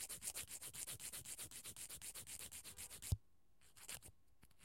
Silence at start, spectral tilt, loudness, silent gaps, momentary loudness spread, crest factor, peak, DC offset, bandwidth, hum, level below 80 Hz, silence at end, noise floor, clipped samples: 0 s; -2 dB/octave; -50 LUFS; none; 7 LU; 26 dB; -26 dBFS; under 0.1%; 16.5 kHz; none; -64 dBFS; 0 s; -76 dBFS; under 0.1%